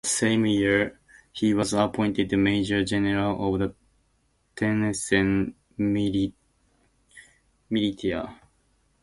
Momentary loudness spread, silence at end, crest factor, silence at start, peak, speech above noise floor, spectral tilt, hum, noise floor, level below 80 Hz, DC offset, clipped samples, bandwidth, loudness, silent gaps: 9 LU; 0.7 s; 18 dB; 0.05 s; -8 dBFS; 44 dB; -5 dB/octave; none; -68 dBFS; -50 dBFS; under 0.1%; under 0.1%; 11.5 kHz; -25 LUFS; none